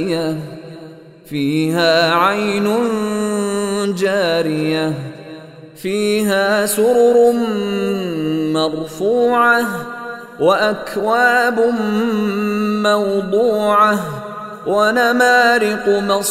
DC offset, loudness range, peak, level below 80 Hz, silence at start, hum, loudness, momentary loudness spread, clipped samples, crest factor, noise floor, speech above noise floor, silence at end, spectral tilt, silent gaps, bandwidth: under 0.1%; 3 LU; 0 dBFS; -54 dBFS; 0 s; none; -16 LUFS; 14 LU; under 0.1%; 16 dB; -37 dBFS; 22 dB; 0 s; -4.5 dB/octave; none; 16 kHz